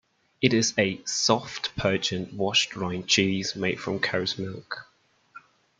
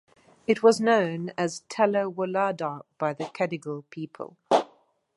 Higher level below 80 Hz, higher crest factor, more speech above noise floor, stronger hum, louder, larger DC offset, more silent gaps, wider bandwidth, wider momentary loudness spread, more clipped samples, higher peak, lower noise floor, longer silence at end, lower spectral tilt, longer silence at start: first, -60 dBFS vs -74 dBFS; about the same, 24 dB vs 20 dB; second, 25 dB vs 35 dB; neither; about the same, -25 LUFS vs -26 LUFS; neither; neither; second, 9.6 kHz vs 11.5 kHz; second, 10 LU vs 16 LU; neither; about the same, -4 dBFS vs -6 dBFS; second, -52 dBFS vs -61 dBFS; about the same, 0.4 s vs 0.5 s; second, -3.5 dB/octave vs -5 dB/octave; about the same, 0.4 s vs 0.5 s